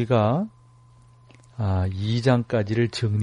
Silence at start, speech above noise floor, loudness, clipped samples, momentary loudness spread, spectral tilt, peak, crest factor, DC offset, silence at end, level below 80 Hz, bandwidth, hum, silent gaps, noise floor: 0 s; 30 dB; -24 LUFS; under 0.1%; 9 LU; -7.5 dB/octave; -6 dBFS; 18 dB; under 0.1%; 0 s; -52 dBFS; 10.5 kHz; none; none; -53 dBFS